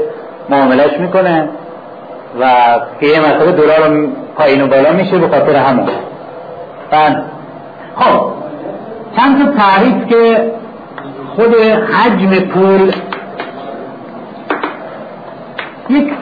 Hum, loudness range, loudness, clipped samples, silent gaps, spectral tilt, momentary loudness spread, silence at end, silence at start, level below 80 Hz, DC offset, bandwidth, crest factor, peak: none; 6 LU; -10 LUFS; under 0.1%; none; -9 dB/octave; 19 LU; 0 s; 0 s; -52 dBFS; 0.2%; 5 kHz; 12 dB; 0 dBFS